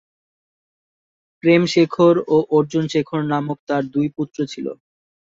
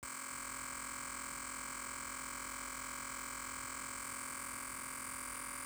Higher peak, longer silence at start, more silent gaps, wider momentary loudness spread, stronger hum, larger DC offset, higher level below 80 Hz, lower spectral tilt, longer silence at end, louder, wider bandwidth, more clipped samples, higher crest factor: first, -2 dBFS vs -32 dBFS; first, 1.45 s vs 0 s; first, 3.59-3.67 s vs none; first, 11 LU vs 0 LU; neither; neither; about the same, -62 dBFS vs -64 dBFS; first, -6.5 dB/octave vs -1 dB/octave; first, 0.65 s vs 0 s; first, -19 LUFS vs -42 LUFS; second, 7.8 kHz vs over 20 kHz; neither; about the same, 18 dB vs 14 dB